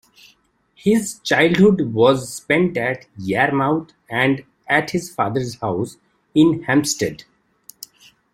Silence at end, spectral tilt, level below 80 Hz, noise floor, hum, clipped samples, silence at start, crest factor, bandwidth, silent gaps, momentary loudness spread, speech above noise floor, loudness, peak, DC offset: 1.15 s; -5 dB/octave; -56 dBFS; -58 dBFS; none; under 0.1%; 0.85 s; 18 dB; 16.5 kHz; none; 11 LU; 40 dB; -19 LUFS; -2 dBFS; under 0.1%